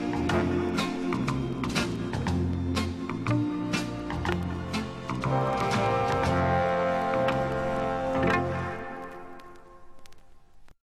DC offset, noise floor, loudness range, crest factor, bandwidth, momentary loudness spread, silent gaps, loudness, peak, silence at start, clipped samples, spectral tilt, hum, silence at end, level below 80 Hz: under 0.1%; -49 dBFS; 4 LU; 18 dB; 14 kHz; 8 LU; none; -28 LUFS; -10 dBFS; 0 s; under 0.1%; -6 dB/octave; none; 0.2 s; -48 dBFS